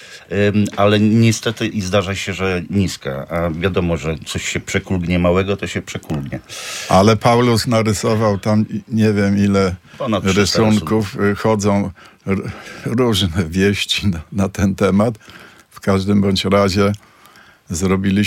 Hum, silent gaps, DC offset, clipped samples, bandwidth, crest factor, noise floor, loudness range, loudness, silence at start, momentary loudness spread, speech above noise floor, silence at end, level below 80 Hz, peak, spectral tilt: none; none; under 0.1%; under 0.1%; 16 kHz; 16 dB; -46 dBFS; 4 LU; -17 LUFS; 0 s; 11 LU; 30 dB; 0 s; -42 dBFS; 0 dBFS; -5.5 dB/octave